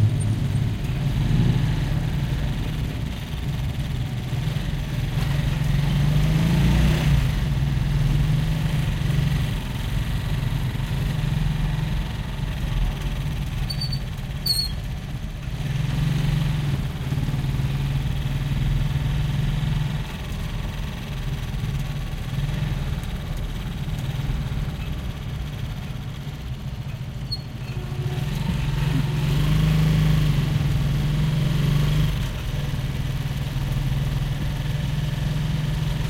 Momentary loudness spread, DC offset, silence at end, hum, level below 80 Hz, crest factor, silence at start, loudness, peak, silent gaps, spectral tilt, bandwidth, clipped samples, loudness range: 10 LU; under 0.1%; 0 s; none; -28 dBFS; 14 dB; 0 s; -25 LUFS; -8 dBFS; none; -6.5 dB/octave; 16.5 kHz; under 0.1%; 7 LU